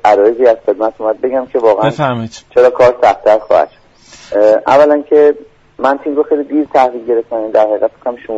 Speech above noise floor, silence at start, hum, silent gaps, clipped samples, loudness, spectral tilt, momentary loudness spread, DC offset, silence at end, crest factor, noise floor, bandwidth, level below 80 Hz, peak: 28 dB; 0.05 s; none; none; under 0.1%; -11 LUFS; -6.5 dB/octave; 8 LU; under 0.1%; 0 s; 12 dB; -39 dBFS; 8 kHz; -50 dBFS; 0 dBFS